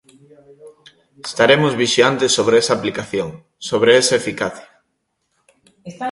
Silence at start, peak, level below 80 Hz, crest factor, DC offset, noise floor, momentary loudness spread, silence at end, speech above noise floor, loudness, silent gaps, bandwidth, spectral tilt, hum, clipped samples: 0.65 s; 0 dBFS; -58 dBFS; 18 dB; under 0.1%; -71 dBFS; 16 LU; 0 s; 54 dB; -16 LUFS; none; 11.5 kHz; -3.5 dB/octave; none; under 0.1%